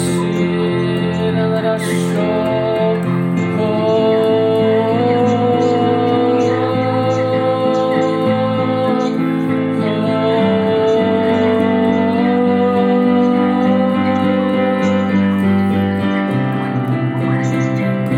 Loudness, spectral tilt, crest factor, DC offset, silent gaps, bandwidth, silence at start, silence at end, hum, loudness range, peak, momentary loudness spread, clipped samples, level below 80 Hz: -15 LUFS; -7.5 dB/octave; 12 dB; under 0.1%; none; 16 kHz; 0 s; 0 s; none; 2 LU; -4 dBFS; 3 LU; under 0.1%; -56 dBFS